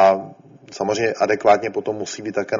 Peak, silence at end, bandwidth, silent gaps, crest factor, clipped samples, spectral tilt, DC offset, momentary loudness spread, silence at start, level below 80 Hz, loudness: -2 dBFS; 0 s; 7.6 kHz; none; 18 dB; under 0.1%; -3.5 dB/octave; under 0.1%; 11 LU; 0 s; -62 dBFS; -20 LUFS